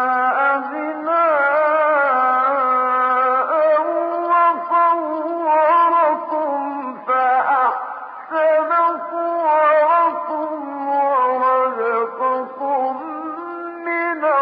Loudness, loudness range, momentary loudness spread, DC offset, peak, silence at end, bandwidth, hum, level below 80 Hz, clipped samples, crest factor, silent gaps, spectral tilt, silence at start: -18 LUFS; 4 LU; 11 LU; under 0.1%; -6 dBFS; 0 s; 5.2 kHz; none; -76 dBFS; under 0.1%; 10 dB; none; -8 dB/octave; 0 s